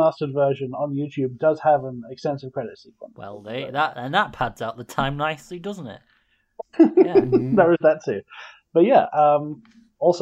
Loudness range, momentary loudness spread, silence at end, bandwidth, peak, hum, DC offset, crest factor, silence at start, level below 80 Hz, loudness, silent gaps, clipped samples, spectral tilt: 8 LU; 19 LU; 0 s; 12.5 kHz; -2 dBFS; none; under 0.1%; 18 dB; 0 s; -54 dBFS; -21 LUFS; none; under 0.1%; -7 dB/octave